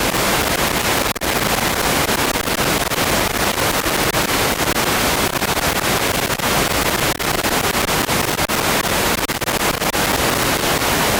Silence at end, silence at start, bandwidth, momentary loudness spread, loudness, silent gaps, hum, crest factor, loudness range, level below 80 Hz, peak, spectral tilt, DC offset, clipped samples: 0 s; 0 s; 19 kHz; 2 LU; -17 LUFS; none; none; 14 dB; 0 LU; -34 dBFS; -4 dBFS; -2.5 dB/octave; under 0.1%; under 0.1%